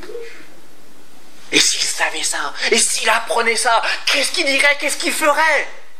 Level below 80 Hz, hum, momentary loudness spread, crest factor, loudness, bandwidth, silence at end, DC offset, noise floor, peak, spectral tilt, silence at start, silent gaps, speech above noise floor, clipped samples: -68 dBFS; none; 6 LU; 18 dB; -15 LUFS; 16 kHz; 0.2 s; 5%; -47 dBFS; 0 dBFS; 0.5 dB/octave; 0 s; none; 30 dB; under 0.1%